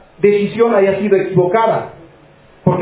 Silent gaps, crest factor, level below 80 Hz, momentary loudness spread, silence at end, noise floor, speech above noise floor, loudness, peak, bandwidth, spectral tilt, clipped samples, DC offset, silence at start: none; 14 dB; -50 dBFS; 7 LU; 0 s; -45 dBFS; 32 dB; -14 LUFS; 0 dBFS; 4 kHz; -11.5 dB/octave; under 0.1%; under 0.1%; 0.2 s